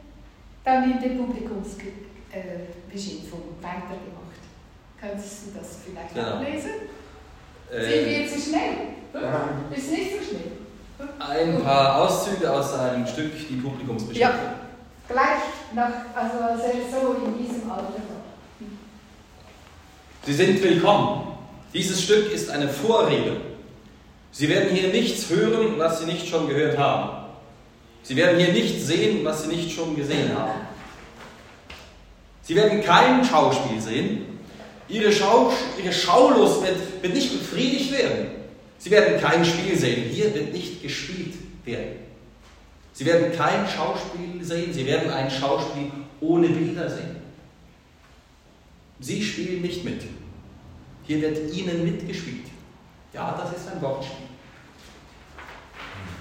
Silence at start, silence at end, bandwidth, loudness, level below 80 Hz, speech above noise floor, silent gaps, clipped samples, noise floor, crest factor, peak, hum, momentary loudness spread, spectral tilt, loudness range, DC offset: 0.05 s; 0 s; 16 kHz; -23 LUFS; -52 dBFS; 30 dB; none; under 0.1%; -53 dBFS; 24 dB; 0 dBFS; none; 21 LU; -5 dB/octave; 13 LU; under 0.1%